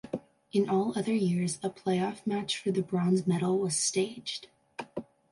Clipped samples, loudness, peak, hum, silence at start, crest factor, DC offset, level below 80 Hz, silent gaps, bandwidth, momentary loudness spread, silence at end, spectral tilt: under 0.1%; -30 LUFS; -14 dBFS; none; 0.05 s; 16 dB; under 0.1%; -72 dBFS; none; 11.5 kHz; 13 LU; 0.3 s; -5 dB/octave